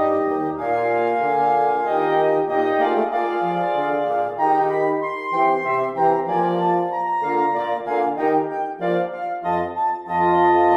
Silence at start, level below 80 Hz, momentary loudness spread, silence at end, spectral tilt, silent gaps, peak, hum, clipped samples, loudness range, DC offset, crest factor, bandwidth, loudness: 0 s; -62 dBFS; 5 LU; 0 s; -7.5 dB/octave; none; -6 dBFS; none; under 0.1%; 2 LU; under 0.1%; 14 dB; 8 kHz; -20 LUFS